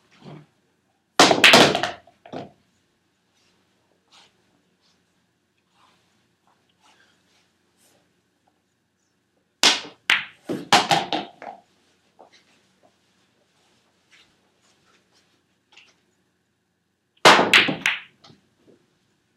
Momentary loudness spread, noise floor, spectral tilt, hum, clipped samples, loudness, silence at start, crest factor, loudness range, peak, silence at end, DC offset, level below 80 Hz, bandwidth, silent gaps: 27 LU; -72 dBFS; -2 dB/octave; none; under 0.1%; -17 LUFS; 0.25 s; 26 dB; 8 LU; 0 dBFS; 1.35 s; under 0.1%; -68 dBFS; 16 kHz; none